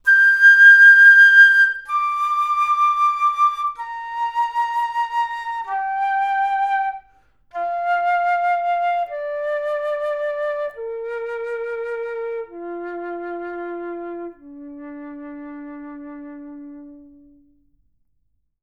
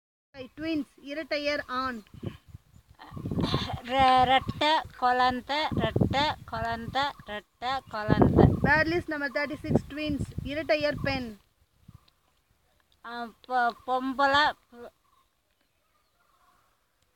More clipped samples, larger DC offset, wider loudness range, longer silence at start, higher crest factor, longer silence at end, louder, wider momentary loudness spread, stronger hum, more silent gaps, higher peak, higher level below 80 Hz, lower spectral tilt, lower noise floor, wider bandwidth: neither; first, 0.1% vs under 0.1%; first, 23 LU vs 8 LU; second, 0.05 s vs 0.35 s; second, 16 dB vs 24 dB; second, 1.65 s vs 2.25 s; first, -15 LUFS vs -27 LUFS; first, 27 LU vs 18 LU; neither; neither; about the same, -2 dBFS vs -4 dBFS; second, -62 dBFS vs -46 dBFS; second, -1.5 dB/octave vs -6.5 dB/octave; about the same, -70 dBFS vs -73 dBFS; second, 12.5 kHz vs 17 kHz